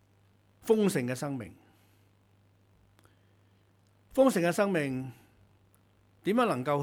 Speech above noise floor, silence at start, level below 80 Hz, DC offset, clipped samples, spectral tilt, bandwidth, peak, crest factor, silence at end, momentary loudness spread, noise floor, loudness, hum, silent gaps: 37 dB; 0.65 s; -70 dBFS; under 0.1%; under 0.1%; -6 dB/octave; 19.5 kHz; -12 dBFS; 20 dB; 0 s; 15 LU; -65 dBFS; -29 LUFS; none; none